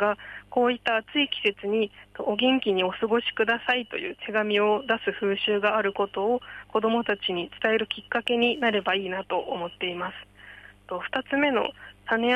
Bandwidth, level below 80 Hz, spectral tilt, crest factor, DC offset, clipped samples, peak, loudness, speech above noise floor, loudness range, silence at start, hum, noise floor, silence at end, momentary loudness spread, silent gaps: 9.2 kHz; -62 dBFS; -5.5 dB/octave; 16 dB; under 0.1%; under 0.1%; -10 dBFS; -26 LUFS; 22 dB; 3 LU; 0 s; 50 Hz at -60 dBFS; -48 dBFS; 0 s; 10 LU; none